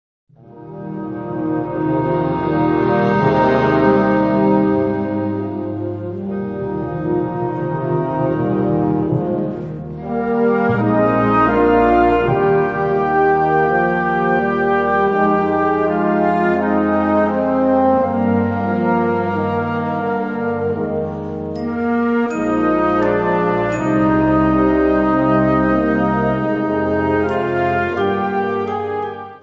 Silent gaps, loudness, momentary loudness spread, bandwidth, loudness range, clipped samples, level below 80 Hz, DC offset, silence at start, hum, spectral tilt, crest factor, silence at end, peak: none; -17 LUFS; 9 LU; 7.2 kHz; 5 LU; under 0.1%; -40 dBFS; under 0.1%; 0.55 s; none; -9 dB/octave; 16 dB; 0.05 s; -2 dBFS